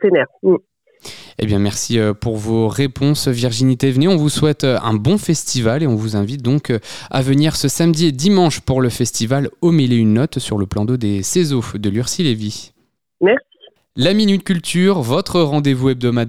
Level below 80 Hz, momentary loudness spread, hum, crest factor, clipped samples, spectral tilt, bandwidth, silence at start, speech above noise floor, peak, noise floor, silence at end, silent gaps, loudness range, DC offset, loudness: -44 dBFS; 6 LU; none; 14 dB; under 0.1%; -5.5 dB/octave; 16 kHz; 0 s; 22 dB; -2 dBFS; -37 dBFS; 0 s; none; 3 LU; 1%; -16 LUFS